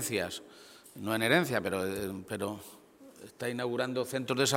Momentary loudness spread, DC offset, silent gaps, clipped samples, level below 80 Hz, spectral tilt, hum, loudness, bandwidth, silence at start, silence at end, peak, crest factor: 24 LU; under 0.1%; none; under 0.1%; -68 dBFS; -4 dB/octave; none; -32 LUFS; 17 kHz; 0 s; 0 s; -10 dBFS; 24 dB